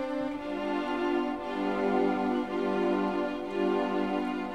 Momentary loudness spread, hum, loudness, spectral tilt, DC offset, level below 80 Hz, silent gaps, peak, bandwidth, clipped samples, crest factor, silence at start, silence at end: 5 LU; none; -30 LUFS; -7 dB/octave; 0.2%; -60 dBFS; none; -16 dBFS; 10 kHz; under 0.1%; 14 dB; 0 s; 0 s